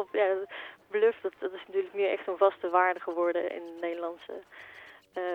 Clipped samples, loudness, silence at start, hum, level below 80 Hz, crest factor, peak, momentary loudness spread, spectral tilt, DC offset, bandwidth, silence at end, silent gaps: under 0.1%; -30 LUFS; 0 s; none; -78 dBFS; 20 dB; -10 dBFS; 18 LU; -5.5 dB/octave; under 0.1%; 6 kHz; 0 s; none